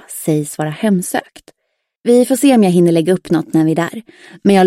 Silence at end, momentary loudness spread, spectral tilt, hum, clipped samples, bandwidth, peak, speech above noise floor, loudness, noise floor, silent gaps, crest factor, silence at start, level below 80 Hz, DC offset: 0 s; 11 LU; -6 dB/octave; none; under 0.1%; 16.5 kHz; 0 dBFS; 58 dB; -14 LUFS; -71 dBFS; 1.97-2.04 s; 12 dB; 0.1 s; -58 dBFS; under 0.1%